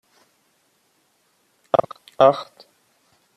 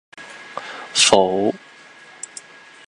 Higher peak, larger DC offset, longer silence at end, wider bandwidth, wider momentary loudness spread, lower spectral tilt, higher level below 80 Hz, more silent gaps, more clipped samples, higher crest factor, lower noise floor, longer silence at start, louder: about the same, -2 dBFS vs 0 dBFS; neither; second, 0.95 s vs 1.3 s; about the same, 12 kHz vs 11.5 kHz; about the same, 23 LU vs 24 LU; first, -6 dB/octave vs -2 dB/octave; second, -68 dBFS vs -60 dBFS; neither; neither; about the same, 22 dB vs 22 dB; first, -65 dBFS vs -44 dBFS; first, 1.75 s vs 0.15 s; second, -19 LUFS vs -16 LUFS